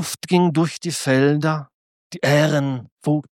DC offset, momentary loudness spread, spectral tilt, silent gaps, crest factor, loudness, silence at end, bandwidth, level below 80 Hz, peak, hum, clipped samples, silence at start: under 0.1%; 10 LU; -5.5 dB/octave; 1.74-2.10 s, 2.92-2.97 s; 16 dB; -20 LUFS; 0.1 s; 17 kHz; -66 dBFS; -4 dBFS; none; under 0.1%; 0 s